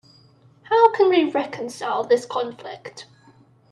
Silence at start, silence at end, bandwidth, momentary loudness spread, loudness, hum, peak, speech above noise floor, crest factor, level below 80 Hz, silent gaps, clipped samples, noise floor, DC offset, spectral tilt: 0.7 s; 0.7 s; 12 kHz; 21 LU; -20 LUFS; none; -2 dBFS; 31 dB; 20 dB; -74 dBFS; none; under 0.1%; -54 dBFS; under 0.1%; -4.5 dB/octave